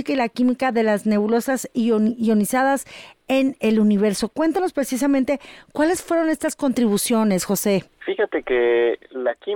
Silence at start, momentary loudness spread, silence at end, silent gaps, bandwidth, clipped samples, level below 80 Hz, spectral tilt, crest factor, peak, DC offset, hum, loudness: 0 s; 6 LU; 0 s; none; 18.5 kHz; under 0.1%; -56 dBFS; -5 dB/octave; 10 dB; -10 dBFS; under 0.1%; none; -20 LUFS